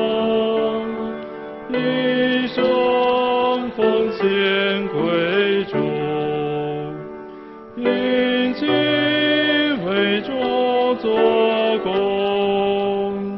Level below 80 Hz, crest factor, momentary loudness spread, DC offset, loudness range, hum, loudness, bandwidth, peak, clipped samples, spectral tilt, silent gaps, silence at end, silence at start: -56 dBFS; 16 dB; 9 LU; under 0.1%; 4 LU; none; -19 LUFS; 5.8 kHz; -4 dBFS; under 0.1%; -8 dB/octave; none; 0 s; 0 s